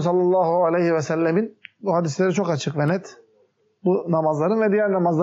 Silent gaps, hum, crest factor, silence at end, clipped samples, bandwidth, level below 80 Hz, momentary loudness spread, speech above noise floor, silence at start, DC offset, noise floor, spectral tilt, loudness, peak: none; none; 12 dB; 0 s; under 0.1%; 8 kHz; -74 dBFS; 6 LU; 42 dB; 0 s; under 0.1%; -62 dBFS; -6.5 dB/octave; -21 LUFS; -10 dBFS